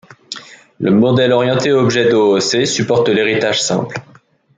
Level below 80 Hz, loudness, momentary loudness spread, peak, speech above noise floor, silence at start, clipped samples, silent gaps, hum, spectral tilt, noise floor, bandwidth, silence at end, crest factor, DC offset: -56 dBFS; -13 LUFS; 17 LU; 0 dBFS; 20 dB; 0.3 s; under 0.1%; none; none; -4.5 dB/octave; -33 dBFS; 9.4 kHz; 0.55 s; 14 dB; under 0.1%